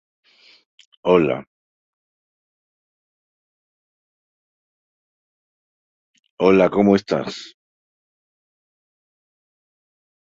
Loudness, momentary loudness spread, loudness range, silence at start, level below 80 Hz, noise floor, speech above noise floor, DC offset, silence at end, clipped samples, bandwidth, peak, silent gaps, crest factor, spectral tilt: -18 LUFS; 14 LU; 7 LU; 1.05 s; -58 dBFS; under -90 dBFS; over 73 dB; under 0.1%; 2.9 s; under 0.1%; 7.6 kHz; -2 dBFS; 1.47-6.14 s, 6.30-6.37 s; 24 dB; -7 dB/octave